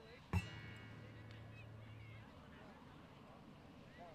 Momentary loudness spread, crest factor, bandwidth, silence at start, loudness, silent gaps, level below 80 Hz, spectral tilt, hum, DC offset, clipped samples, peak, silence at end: 15 LU; 24 dB; 15 kHz; 0 s; -53 LUFS; none; -66 dBFS; -6.5 dB/octave; none; under 0.1%; under 0.1%; -28 dBFS; 0 s